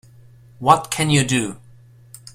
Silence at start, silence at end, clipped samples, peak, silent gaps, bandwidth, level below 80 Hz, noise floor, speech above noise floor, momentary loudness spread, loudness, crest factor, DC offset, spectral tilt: 0.6 s; 0.05 s; under 0.1%; 0 dBFS; none; 16 kHz; -50 dBFS; -47 dBFS; 29 dB; 7 LU; -18 LUFS; 22 dB; under 0.1%; -4 dB/octave